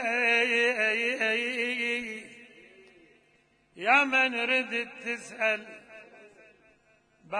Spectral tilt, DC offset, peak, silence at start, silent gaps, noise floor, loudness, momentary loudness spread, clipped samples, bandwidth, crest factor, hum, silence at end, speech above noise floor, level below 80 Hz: -2 dB/octave; under 0.1%; -10 dBFS; 0 s; none; -66 dBFS; -26 LUFS; 14 LU; under 0.1%; 10.5 kHz; 20 dB; none; 0 s; 38 dB; -78 dBFS